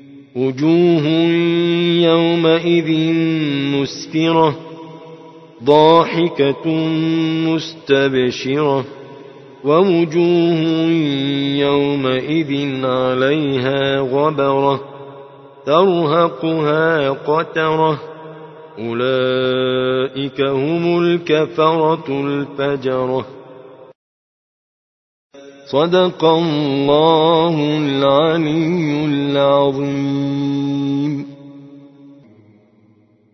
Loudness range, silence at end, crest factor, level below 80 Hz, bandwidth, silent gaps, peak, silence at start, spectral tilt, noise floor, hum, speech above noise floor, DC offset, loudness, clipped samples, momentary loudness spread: 5 LU; 1.25 s; 16 dB; -58 dBFS; 6.2 kHz; 23.95-25.30 s; 0 dBFS; 0.1 s; -7 dB/octave; -53 dBFS; none; 37 dB; under 0.1%; -16 LUFS; under 0.1%; 9 LU